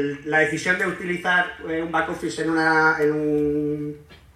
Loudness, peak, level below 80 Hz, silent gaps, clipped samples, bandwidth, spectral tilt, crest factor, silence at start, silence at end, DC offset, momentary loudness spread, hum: -22 LUFS; -6 dBFS; -54 dBFS; none; under 0.1%; 14.5 kHz; -5 dB/octave; 16 dB; 0 s; 0.2 s; under 0.1%; 10 LU; none